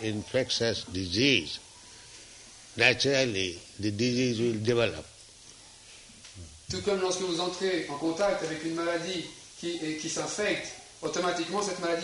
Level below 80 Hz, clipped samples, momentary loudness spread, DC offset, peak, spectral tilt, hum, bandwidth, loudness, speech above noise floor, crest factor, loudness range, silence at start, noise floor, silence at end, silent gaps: -60 dBFS; under 0.1%; 23 LU; under 0.1%; -6 dBFS; -3.5 dB/octave; none; 11.5 kHz; -29 LUFS; 23 dB; 24 dB; 4 LU; 0 s; -52 dBFS; 0 s; none